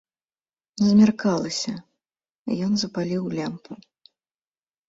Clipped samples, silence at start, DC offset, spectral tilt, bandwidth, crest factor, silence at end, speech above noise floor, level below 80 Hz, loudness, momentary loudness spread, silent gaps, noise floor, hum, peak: under 0.1%; 0.75 s; under 0.1%; -5.5 dB/octave; 8 kHz; 18 dB; 1.15 s; over 68 dB; -62 dBFS; -23 LUFS; 22 LU; 2.38-2.45 s; under -90 dBFS; none; -6 dBFS